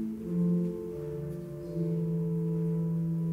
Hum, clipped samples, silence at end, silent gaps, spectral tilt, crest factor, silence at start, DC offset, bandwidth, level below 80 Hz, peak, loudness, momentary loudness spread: none; under 0.1%; 0 s; none; -11 dB/octave; 10 dB; 0 s; under 0.1%; 2.8 kHz; -56 dBFS; -20 dBFS; -32 LUFS; 9 LU